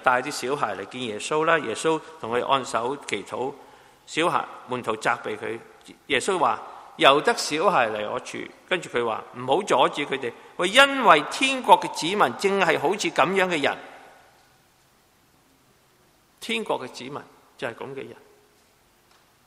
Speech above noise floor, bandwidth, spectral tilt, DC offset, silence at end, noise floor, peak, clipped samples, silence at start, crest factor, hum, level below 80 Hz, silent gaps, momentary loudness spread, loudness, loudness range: 37 dB; 16 kHz; -3 dB/octave; under 0.1%; 1.35 s; -60 dBFS; 0 dBFS; under 0.1%; 0 s; 24 dB; none; -66 dBFS; none; 16 LU; -23 LUFS; 14 LU